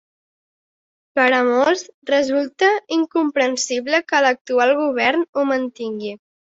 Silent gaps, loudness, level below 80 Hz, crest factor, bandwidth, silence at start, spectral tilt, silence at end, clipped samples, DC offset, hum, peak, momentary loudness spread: 1.94-2.02 s, 4.41-4.45 s, 5.29-5.33 s; -18 LUFS; -68 dBFS; 16 dB; 8 kHz; 1.15 s; -2.5 dB/octave; 0.4 s; under 0.1%; under 0.1%; none; -2 dBFS; 9 LU